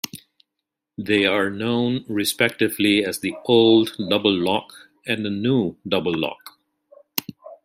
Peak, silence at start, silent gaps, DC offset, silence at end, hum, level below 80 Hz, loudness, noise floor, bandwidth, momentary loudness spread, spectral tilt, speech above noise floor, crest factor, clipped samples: 0 dBFS; 0.05 s; none; under 0.1%; 0.1 s; none; -62 dBFS; -21 LUFS; -82 dBFS; 16 kHz; 12 LU; -4.5 dB/octave; 62 dB; 22 dB; under 0.1%